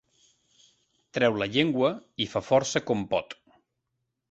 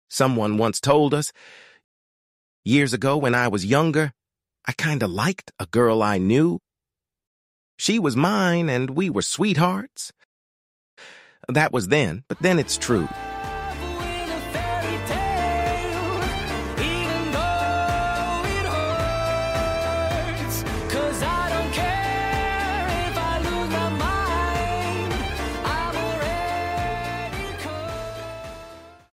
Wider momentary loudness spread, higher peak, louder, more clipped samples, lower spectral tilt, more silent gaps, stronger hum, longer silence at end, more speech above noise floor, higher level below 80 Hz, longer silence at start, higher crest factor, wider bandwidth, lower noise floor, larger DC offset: about the same, 10 LU vs 11 LU; about the same, -6 dBFS vs -4 dBFS; second, -27 LUFS vs -23 LUFS; neither; about the same, -4.5 dB/octave vs -5 dB/octave; second, none vs 1.84-2.63 s, 7.27-7.78 s, 10.25-10.97 s; neither; first, 1 s vs 0.25 s; second, 55 dB vs 67 dB; second, -62 dBFS vs -38 dBFS; first, 1.15 s vs 0.1 s; about the same, 22 dB vs 18 dB; second, 8.2 kHz vs 16 kHz; second, -81 dBFS vs -88 dBFS; neither